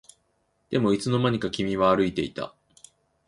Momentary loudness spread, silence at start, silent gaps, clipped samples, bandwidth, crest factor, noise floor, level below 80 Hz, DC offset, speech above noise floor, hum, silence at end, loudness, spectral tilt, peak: 11 LU; 0.7 s; none; under 0.1%; 11.5 kHz; 18 dB; -71 dBFS; -54 dBFS; under 0.1%; 47 dB; none; 0.8 s; -25 LUFS; -6.5 dB/octave; -8 dBFS